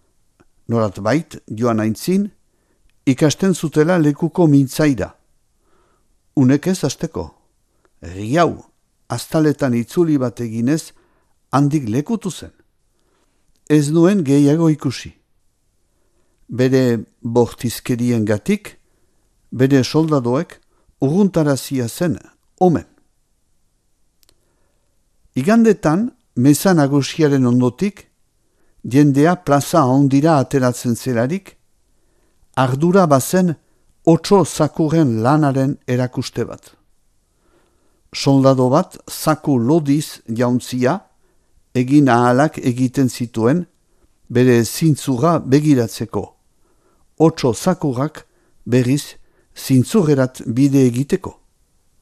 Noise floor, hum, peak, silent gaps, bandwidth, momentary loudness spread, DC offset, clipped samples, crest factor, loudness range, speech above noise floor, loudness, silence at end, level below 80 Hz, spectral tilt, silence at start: -62 dBFS; none; 0 dBFS; none; 14.5 kHz; 12 LU; under 0.1%; under 0.1%; 18 dB; 5 LU; 47 dB; -17 LUFS; 0.7 s; -50 dBFS; -6.5 dB/octave; 0.7 s